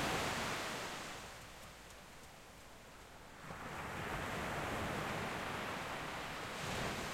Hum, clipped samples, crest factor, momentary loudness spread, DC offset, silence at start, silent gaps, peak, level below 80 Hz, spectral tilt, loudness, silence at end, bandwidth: none; under 0.1%; 18 dB; 16 LU; under 0.1%; 0 s; none; -26 dBFS; -60 dBFS; -3.5 dB/octave; -42 LUFS; 0 s; 16 kHz